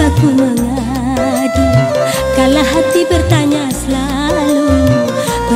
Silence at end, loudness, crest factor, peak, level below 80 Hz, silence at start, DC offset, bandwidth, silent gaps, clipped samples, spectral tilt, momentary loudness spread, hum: 0 s; -12 LUFS; 12 dB; 0 dBFS; -26 dBFS; 0 s; under 0.1%; 16 kHz; none; under 0.1%; -5.5 dB/octave; 5 LU; none